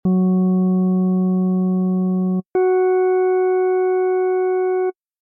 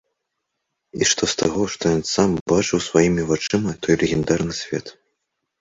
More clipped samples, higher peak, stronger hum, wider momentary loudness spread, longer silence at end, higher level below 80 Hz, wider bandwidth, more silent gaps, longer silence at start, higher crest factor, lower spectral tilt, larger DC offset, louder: neither; second, -12 dBFS vs -2 dBFS; neither; second, 3 LU vs 7 LU; second, 0.3 s vs 0.7 s; second, -62 dBFS vs -46 dBFS; second, 2.4 kHz vs 8 kHz; second, none vs 2.41-2.46 s; second, 0.05 s vs 0.95 s; second, 6 dB vs 20 dB; first, -14 dB/octave vs -4 dB/octave; neither; about the same, -18 LUFS vs -20 LUFS